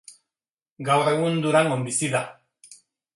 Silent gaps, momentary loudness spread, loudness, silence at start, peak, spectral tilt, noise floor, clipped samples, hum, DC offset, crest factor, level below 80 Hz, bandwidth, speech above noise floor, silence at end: 0.49-0.57 s, 0.71-0.76 s; 9 LU; -22 LUFS; 0.1 s; -6 dBFS; -4.5 dB/octave; under -90 dBFS; under 0.1%; none; under 0.1%; 18 dB; -70 dBFS; 11.5 kHz; over 68 dB; 0.4 s